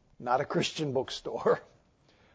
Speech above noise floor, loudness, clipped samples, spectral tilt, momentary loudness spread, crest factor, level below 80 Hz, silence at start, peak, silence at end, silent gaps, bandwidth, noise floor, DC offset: 34 dB; -31 LUFS; under 0.1%; -5 dB/octave; 4 LU; 20 dB; -66 dBFS; 0.2 s; -12 dBFS; 0.7 s; none; 8 kHz; -64 dBFS; under 0.1%